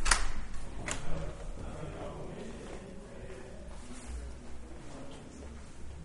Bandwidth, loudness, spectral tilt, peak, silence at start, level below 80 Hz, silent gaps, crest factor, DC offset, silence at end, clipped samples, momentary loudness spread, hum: 11.5 kHz; -42 LUFS; -3 dB/octave; -8 dBFS; 0 s; -40 dBFS; none; 28 dB; under 0.1%; 0 s; under 0.1%; 10 LU; none